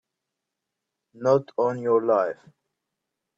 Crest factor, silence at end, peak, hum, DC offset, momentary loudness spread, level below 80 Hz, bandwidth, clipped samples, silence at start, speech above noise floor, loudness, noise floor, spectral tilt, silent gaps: 18 dB; 1.05 s; -8 dBFS; none; under 0.1%; 8 LU; -76 dBFS; 7.8 kHz; under 0.1%; 1.2 s; 61 dB; -24 LUFS; -84 dBFS; -7.5 dB/octave; none